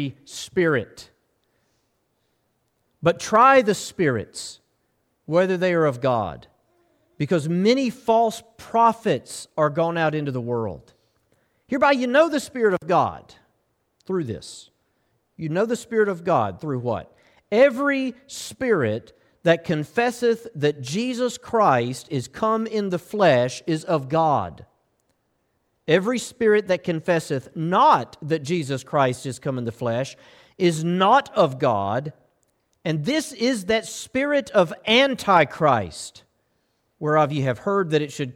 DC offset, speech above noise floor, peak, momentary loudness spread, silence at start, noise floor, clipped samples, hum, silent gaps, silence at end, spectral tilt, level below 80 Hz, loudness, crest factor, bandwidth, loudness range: under 0.1%; 49 dB; -4 dBFS; 12 LU; 0 s; -70 dBFS; under 0.1%; none; none; 0.05 s; -5.5 dB/octave; -60 dBFS; -22 LUFS; 18 dB; 16.5 kHz; 4 LU